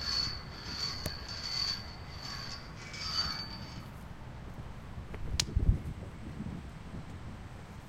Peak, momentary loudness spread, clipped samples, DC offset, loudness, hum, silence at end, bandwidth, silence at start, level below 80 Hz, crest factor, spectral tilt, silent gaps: -6 dBFS; 14 LU; under 0.1%; under 0.1%; -37 LUFS; none; 0 s; 16 kHz; 0 s; -42 dBFS; 32 dB; -3.5 dB/octave; none